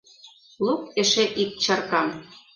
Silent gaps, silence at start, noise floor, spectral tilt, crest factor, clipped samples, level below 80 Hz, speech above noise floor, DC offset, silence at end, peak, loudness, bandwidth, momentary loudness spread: none; 0.25 s; -51 dBFS; -2.5 dB/octave; 18 dB; under 0.1%; -66 dBFS; 27 dB; under 0.1%; 0.15 s; -8 dBFS; -23 LUFS; 10.5 kHz; 9 LU